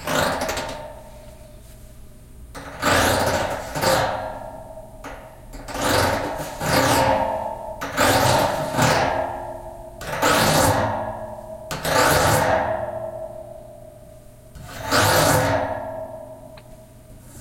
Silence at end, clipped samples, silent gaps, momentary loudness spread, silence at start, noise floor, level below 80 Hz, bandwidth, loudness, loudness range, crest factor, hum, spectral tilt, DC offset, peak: 0 s; under 0.1%; none; 21 LU; 0 s; -44 dBFS; -42 dBFS; 16.5 kHz; -20 LUFS; 4 LU; 20 dB; none; -3.5 dB/octave; under 0.1%; -2 dBFS